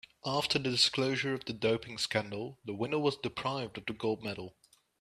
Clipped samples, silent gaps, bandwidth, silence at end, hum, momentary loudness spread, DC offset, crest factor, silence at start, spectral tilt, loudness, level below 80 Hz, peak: under 0.1%; none; 14 kHz; 0.5 s; none; 14 LU; under 0.1%; 20 dB; 0.25 s; -4 dB/octave; -33 LUFS; -68 dBFS; -14 dBFS